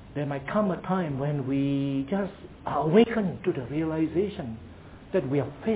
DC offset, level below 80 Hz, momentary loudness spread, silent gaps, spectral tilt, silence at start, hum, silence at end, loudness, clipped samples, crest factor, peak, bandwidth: under 0.1%; -52 dBFS; 15 LU; none; -7 dB/octave; 0 s; none; 0 s; -27 LUFS; under 0.1%; 20 dB; -6 dBFS; 4 kHz